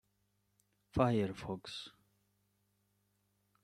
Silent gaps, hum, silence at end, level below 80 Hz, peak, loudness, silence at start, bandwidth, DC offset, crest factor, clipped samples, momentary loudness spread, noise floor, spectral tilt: none; 50 Hz at -65 dBFS; 1.75 s; -62 dBFS; -16 dBFS; -37 LUFS; 0.95 s; 14 kHz; under 0.1%; 26 dB; under 0.1%; 15 LU; -80 dBFS; -7 dB/octave